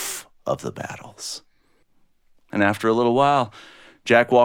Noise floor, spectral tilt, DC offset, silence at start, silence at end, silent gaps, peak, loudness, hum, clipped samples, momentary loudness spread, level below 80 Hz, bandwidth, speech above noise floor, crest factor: -60 dBFS; -4.5 dB/octave; under 0.1%; 0 s; 0 s; none; -2 dBFS; -22 LUFS; none; under 0.1%; 17 LU; -62 dBFS; 18.5 kHz; 40 dB; 20 dB